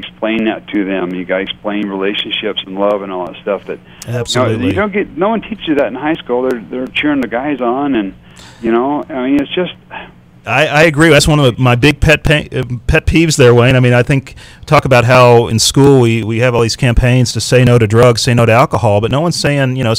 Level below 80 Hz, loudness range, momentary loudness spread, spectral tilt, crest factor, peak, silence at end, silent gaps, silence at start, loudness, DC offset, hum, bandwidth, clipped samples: -28 dBFS; 7 LU; 11 LU; -5.5 dB/octave; 12 dB; 0 dBFS; 0 s; none; 0 s; -12 LUFS; 0.2%; none; 16 kHz; 0.4%